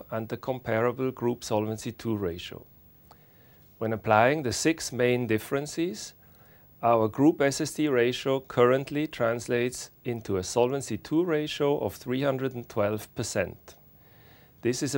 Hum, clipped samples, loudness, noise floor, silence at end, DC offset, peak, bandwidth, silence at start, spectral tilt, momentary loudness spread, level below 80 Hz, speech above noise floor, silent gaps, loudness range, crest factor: none; under 0.1%; -28 LUFS; -56 dBFS; 0 s; under 0.1%; -6 dBFS; 18 kHz; 0 s; -5 dB/octave; 10 LU; -60 dBFS; 29 dB; none; 6 LU; 22 dB